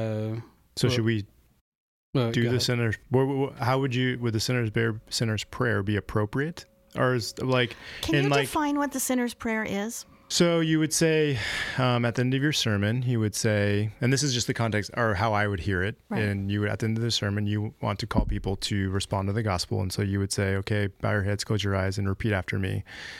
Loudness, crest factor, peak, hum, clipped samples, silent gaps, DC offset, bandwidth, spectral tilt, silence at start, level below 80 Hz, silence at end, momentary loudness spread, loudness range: -27 LUFS; 14 dB; -12 dBFS; none; under 0.1%; 1.61-2.13 s; under 0.1%; 16 kHz; -5 dB/octave; 0 s; -46 dBFS; 0 s; 6 LU; 3 LU